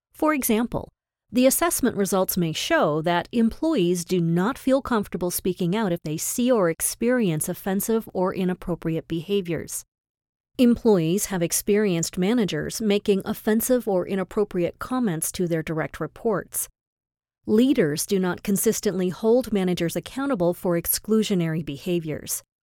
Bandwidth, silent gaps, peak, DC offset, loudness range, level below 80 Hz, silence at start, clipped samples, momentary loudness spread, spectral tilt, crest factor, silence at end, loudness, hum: 18.5 kHz; 9.88-9.92 s, 10.00-10.15 s, 10.29-10.44 s, 16.81-16.97 s; -6 dBFS; under 0.1%; 3 LU; -50 dBFS; 0.2 s; under 0.1%; 7 LU; -5 dB/octave; 18 dB; 0.2 s; -23 LUFS; none